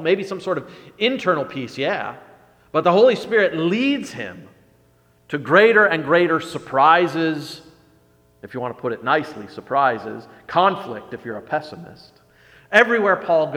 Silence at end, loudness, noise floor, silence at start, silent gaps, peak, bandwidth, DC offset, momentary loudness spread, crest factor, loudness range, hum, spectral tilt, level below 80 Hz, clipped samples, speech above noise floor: 0 s; -19 LUFS; -57 dBFS; 0 s; none; 0 dBFS; 15 kHz; under 0.1%; 18 LU; 20 dB; 6 LU; 60 Hz at -55 dBFS; -5.5 dB/octave; -64 dBFS; under 0.1%; 38 dB